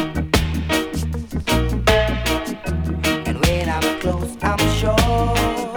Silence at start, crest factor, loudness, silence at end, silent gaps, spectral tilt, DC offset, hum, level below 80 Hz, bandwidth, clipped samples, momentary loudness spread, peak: 0 s; 20 dB; -20 LUFS; 0 s; none; -5 dB/octave; under 0.1%; none; -26 dBFS; over 20 kHz; under 0.1%; 7 LU; 0 dBFS